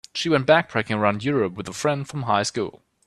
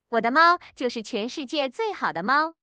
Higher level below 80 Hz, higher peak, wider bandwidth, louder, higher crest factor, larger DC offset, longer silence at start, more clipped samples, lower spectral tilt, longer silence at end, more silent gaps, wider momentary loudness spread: first, -60 dBFS vs -72 dBFS; first, -2 dBFS vs -6 dBFS; first, 13 kHz vs 9.4 kHz; about the same, -22 LUFS vs -24 LUFS; about the same, 20 dB vs 20 dB; neither; about the same, 0.15 s vs 0.1 s; neither; about the same, -5 dB/octave vs -4 dB/octave; first, 0.3 s vs 0.1 s; neither; second, 9 LU vs 12 LU